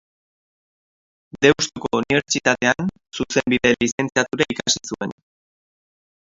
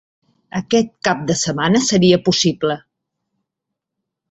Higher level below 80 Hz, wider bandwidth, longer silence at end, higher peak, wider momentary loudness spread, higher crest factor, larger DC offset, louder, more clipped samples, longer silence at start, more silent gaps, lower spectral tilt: about the same, -54 dBFS vs -54 dBFS; about the same, 7.8 kHz vs 8.2 kHz; second, 1.2 s vs 1.5 s; about the same, 0 dBFS vs -2 dBFS; about the same, 11 LU vs 11 LU; about the same, 22 dB vs 18 dB; neither; second, -20 LUFS vs -16 LUFS; neither; first, 1.35 s vs 0.55 s; first, 3.92-3.98 s vs none; about the same, -3.5 dB/octave vs -4.5 dB/octave